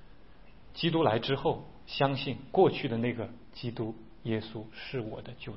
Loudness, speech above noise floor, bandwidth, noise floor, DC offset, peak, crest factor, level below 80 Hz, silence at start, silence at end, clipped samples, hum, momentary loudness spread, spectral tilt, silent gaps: -32 LUFS; 25 dB; 5.8 kHz; -56 dBFS; 0.3%; -10 dBFS; 22 dB; -58 dBFS; 0 s; 0 s; under 0.1%; none; 15 LU; -10 dB/octave; none